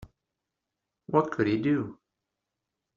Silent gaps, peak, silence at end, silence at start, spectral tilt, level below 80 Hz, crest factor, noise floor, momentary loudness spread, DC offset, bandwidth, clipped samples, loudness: none; -10 dBFS; 1 s; 1.1 s; -6.5 dB/octave; -64 dBFS; 22 dB; -86 dBFS; 5 LU; under 0.1%; 7 kHz; under 0.1%; -27 LUFS